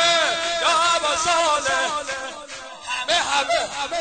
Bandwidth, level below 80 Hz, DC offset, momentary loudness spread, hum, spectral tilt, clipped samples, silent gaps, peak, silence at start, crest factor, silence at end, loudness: 9.4 kHz; -54 dBFS; 0.1%; 13 LU; none; 0 dB/octave; under 0.1%; none; -6 dBFS; 0 s; 16 dB; 0 s; -20 LUFS